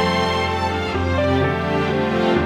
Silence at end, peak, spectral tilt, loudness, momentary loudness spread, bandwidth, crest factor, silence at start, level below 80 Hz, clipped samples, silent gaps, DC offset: 0 s; -4 dBFS; -6 dB/octave; -20 LUFS; 3 LU; 12.5 kHz; 14 dB; 0 s; -38 dBFS; under 0.1%; none; under 0.1%